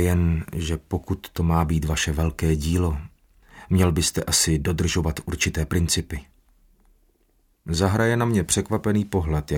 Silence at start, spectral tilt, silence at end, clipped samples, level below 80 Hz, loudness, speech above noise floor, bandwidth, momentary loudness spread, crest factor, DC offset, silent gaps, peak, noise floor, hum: 0 s; -4.5 dB/octave; 0 s; under 0.1%; -34 dBFS; -23 LUFS; 41 dB; 17 kHz; 8 LU; 18 dB; under 0.1%; none; -6 dBFS; -64 dBFS; none